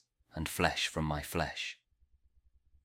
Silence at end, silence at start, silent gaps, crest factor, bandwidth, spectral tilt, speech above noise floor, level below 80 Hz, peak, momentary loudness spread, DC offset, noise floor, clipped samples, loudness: 1.1 s; 0.35 s; none; 26 dB; 16.5 kHz; -4 dB/octave; 35 dB; -52 dBFS; -12 dBFS; 13 LU; under 0.1%; -70 dBFS; under 0.1%; -35 LUFS